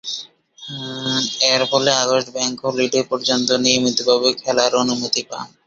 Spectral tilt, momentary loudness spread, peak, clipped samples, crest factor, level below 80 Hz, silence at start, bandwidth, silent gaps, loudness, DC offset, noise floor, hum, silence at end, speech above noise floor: -2.5 dB/octave; 13 LU; 0 dBFS; under 0.1%; 18 dB; -62 dBFS; 0.05 s; 8 kHz; none; -17 LUFS; under 0.1%; -38 dBFS; none; 0.2 s; 20 dB